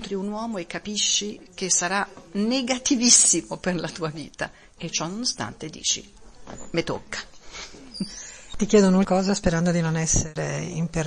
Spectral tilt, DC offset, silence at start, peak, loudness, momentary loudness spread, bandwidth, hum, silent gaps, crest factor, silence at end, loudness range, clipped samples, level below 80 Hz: -3 dB/octave; under 0.1%; 0 s; -2 dBFS; -23 LUFS; 17 LU; 10.5 kHz; none; none; 22 dB; 0 s; 9 LU; under 0.1%; -44 dBFS